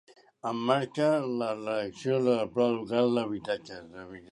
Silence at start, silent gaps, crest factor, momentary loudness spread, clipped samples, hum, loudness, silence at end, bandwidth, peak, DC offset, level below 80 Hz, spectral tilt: 0.45 s; none; 20 dB; 13 LU; under 0.1%; none; -29 LUFS; 0.1 s; 11 kHz; -10 dBFS; under 0.1%; -70 dBFS; -6.5 dB/octave